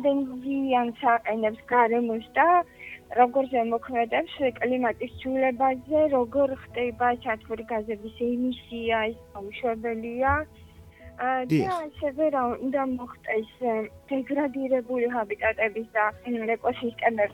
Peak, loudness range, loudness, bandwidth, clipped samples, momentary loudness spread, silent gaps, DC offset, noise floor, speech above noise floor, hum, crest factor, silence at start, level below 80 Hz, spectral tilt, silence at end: -6 dBFS; 5 LU; -26 LUFS; 18 kHz; under 0.1%; 9 LU; none; under 0.1%; -48 dBFS; 22 dB; none; 20 dB; 0 s; -54 dBFS; -7 dB/octave; 0 s